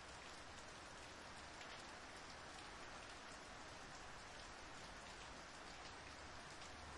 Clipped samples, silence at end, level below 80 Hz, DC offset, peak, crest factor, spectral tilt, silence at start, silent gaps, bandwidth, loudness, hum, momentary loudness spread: under 0.1%; 0 s; -68 dBFS; under 0.1%; -42 dBFS; 14 dB; -2.5 dB/octave; 0 s; none; 12 kHz; -55 LUFS; none; 1 LU